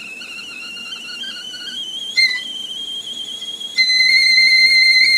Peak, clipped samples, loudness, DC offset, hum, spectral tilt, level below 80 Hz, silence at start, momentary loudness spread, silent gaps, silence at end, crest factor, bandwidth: -2 dBFS; under 0.1%; -12 LUFS; under 0.1%; none; 2.5 dB/octave; -68 dBFS; 0 s; 19 LU; none; 0 s; 14 dB; 16 kHz